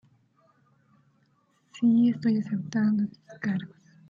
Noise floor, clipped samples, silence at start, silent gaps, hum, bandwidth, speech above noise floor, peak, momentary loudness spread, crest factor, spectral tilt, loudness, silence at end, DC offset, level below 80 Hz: -68 dBFS; under 0.1%; 1.75 s; none; none; 7.2 kHz; 42 dB; -14 dBFS; 12 LU; 14 dB; -7.5 dB/octave; -26 LUFS; 0.45 s; under 0.1%; -72 dBFS